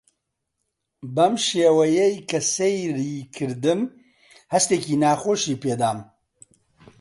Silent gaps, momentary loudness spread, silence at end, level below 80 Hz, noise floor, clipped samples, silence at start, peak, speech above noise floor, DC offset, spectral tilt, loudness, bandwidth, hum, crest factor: none; 12 LU; 1 s; -66 dBFS; -78 dBFS; under 0.1%; 1.05 s; -4 dBFS; 57 dB; under 0.1%; -4 dB/octave; -22 LUFS; 11.5 kHz; none; 18 dB